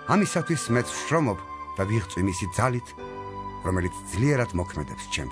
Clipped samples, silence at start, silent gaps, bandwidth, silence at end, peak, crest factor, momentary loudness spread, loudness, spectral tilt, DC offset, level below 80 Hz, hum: under 0.1%; 0 s; none; 11 kHz; 0 s; -8 dBFS; 20 dB; 12 LU; -27 LUFS; -5.5 dB/octave; under 0.1%; -46 dBFS; none